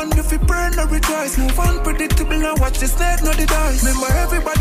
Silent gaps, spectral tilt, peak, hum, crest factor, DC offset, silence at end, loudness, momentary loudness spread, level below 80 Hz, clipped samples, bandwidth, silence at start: none; -4.5 dB/octave; -4 dBFS; none; 12 dB; under 0.1%; 0 s; -18 LUFS; 2 LU; -18 dBFS; under 0.1%; 16 kHz; 0 s